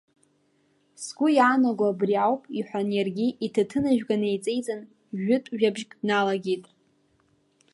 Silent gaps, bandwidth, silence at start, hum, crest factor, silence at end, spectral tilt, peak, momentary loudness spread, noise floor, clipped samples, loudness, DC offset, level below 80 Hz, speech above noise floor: none; 11.5 kHz; 1 s; none; 18 dB; 1.1 s; -5.5 dB/octave; -8 dBFS; 11 LU; -67 dBFS; under 0.1%; -25 LUFS; under 0.1%; -68 dBFS; 42 dB